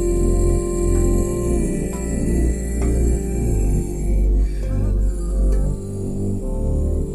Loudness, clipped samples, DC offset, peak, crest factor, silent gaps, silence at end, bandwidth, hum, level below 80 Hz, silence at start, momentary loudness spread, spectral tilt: -22 LUFS; under 0.1%; 0.1%; -6 dBFS; 12 dB; none; 0 s; 12 kHz; none; -20 dBFS; 0 s; 5 LU; -7.5 dB/octave